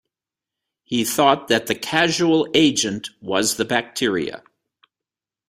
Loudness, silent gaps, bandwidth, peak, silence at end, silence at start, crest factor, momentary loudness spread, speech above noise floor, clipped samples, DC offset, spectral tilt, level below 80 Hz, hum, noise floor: -19 LUFS; none; 16 kHz; -2 dBFS; 1.1 s; 0.9 s; 20 dB; 9 LU; 69 dB; under 0.1%; under 0.1%; -3 dB/octave; -60 dBFS; none; -89 dBFS